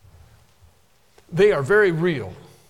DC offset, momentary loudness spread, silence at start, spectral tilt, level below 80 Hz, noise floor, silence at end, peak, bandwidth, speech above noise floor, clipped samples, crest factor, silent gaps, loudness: 0.1%; 14 LU; 1.3 s; -6.5 dB/octave; -52 dBFS; -59 dBFS; 0.3 s; -6 dBFS; 12 kHz; 41 dB; under 0.1%; 16 dB; none; -19 LUFS